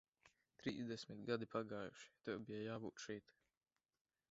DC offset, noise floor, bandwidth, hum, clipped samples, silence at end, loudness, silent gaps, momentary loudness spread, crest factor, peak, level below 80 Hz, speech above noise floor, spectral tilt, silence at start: under 0.1%; under -90 dBFS; 7.6 kHz; none; under 0.1%; 1 s; -49 LUFS; none; 8 LU; 22 dB; -28 dBFS; -82 dBFS; over 41 dB; -4.5 dB/octave; 0.25 s